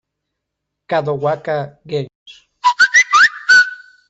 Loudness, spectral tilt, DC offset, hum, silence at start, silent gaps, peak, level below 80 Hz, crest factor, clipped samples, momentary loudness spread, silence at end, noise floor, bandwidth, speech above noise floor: -13 LUFS; -2 dB/octave; under 0.1%; none; 0.9 s; 2.15-2.26 s; -2 dBFS; -62 dBFS; 14 dB; under 0.1%; 15 LU; 0.35 s; -78 dBFS; 8.2 kHz; 58 dB